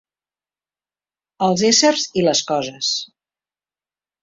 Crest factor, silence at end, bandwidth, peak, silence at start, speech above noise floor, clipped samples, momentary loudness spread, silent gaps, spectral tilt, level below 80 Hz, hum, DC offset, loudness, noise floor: 18 dB; 1.2 s; 7.8 kHz; -2 dBFS; 1.4 s; over 72 dB; under 0.1%; 10 LU; none; -3 dB/octave; -62 dBFS; 50 Hz at -50 dBFS; under 0.1%; -17 LUFS; under -90 dBFS